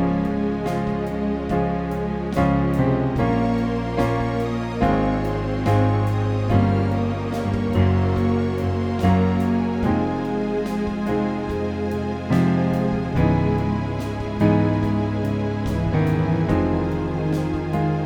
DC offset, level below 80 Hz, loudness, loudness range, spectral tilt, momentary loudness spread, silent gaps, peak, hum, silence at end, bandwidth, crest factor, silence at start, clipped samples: under 0.1%; -36 dBFS; -22 LUFS; 1 LU; -8.5 dB/octave; 6 LU; none; -6 dBFS; none; 0 s; 11 kHz; 16 dB; 0 s; under 0.1%